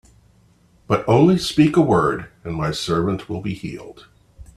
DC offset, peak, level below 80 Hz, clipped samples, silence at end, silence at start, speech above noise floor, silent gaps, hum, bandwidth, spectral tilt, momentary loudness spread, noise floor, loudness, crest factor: under 0.1%; 0 dBFS; -46 dBFS; under 0.1%; 0.15 s; 0.9 s; 36 dB; none; none; 13.5 kHz; -6.5 dB/octave; 15 LU; -55 dBFS; -19 LUFS; 20 dB